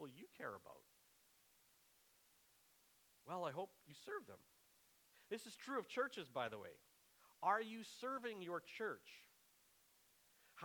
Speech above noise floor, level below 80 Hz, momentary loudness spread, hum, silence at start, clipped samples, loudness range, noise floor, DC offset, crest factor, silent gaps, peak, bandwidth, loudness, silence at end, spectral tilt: 28 dB; under -90 dBFS; 21 LU; none; 0 s; under 0.1%; 9 LU; -75 dBFS; under 0.1%; 24 dB; none; -26 dBFS; 19.5 kHz; -48 LUFS; 0 s; -4 dB/octave